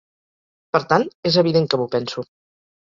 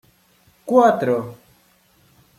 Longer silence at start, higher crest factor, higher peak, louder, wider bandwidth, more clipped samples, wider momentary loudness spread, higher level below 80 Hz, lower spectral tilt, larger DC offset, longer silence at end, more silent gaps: about the same, 0.75 s vs 0.65 s; about the same, 20 dB vs 18 dB; about the same, -2 dBFS vs -2 dBFS; about the same, -19 LUFS vs -18 LUFS; second, 7.4 kHz vs 14 kHz; neither; second, 13 LU vs 22 LU; first, -60 dBFS vs -66 dBFS; about the same, -6 dB/octave vs -7 dB/octave; neither; second, 0.65 s vs 1.05 s; first, 1.15-1.23 s vs none